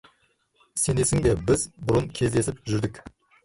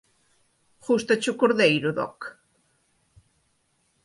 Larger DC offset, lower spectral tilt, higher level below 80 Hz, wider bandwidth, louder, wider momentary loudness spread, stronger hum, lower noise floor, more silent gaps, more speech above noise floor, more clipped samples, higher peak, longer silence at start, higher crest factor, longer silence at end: neither; about the same, -5 dB/octave vs -4.5 dB/octave; first, -42 dBFS vs -68 dBFS; about the same, 12 kHz vs 11.5 kHz; about the same, -25 LUFS vs -23 LUFS; second, 6 LU vs 20 LU; neither; about the same, -67 dBFS vs -69 dBFS; neither; second, 43 dB vs 47 dB; neither; second, -10 dBFS vs -6 dBFS; second, 0.75 s vs 0.9 s; about the same, 16 dB vs 20 dB; second, 0.35 s vs 1.7 s